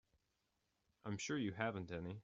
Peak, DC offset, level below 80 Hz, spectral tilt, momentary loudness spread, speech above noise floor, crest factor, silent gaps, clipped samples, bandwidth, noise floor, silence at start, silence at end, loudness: -24 dBFS; under 0.1%; -74 dBFS; -5 dB/octave; 8 LU; 42 dB; 22 dB; none; under 0.1%; 7.4 kHz; -86 dBFS; 1.05 s; 0 s; -44 LUFS